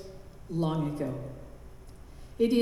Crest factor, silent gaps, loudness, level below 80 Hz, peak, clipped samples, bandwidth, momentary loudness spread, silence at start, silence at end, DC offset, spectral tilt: 18 dB; none; -32 LUFS; -50 dBFS; -14 dBFS; under 0.1%; 13.5 kHz; 22 LU; 0 s; 0 s; under 0.1%; -7.5 dB/octave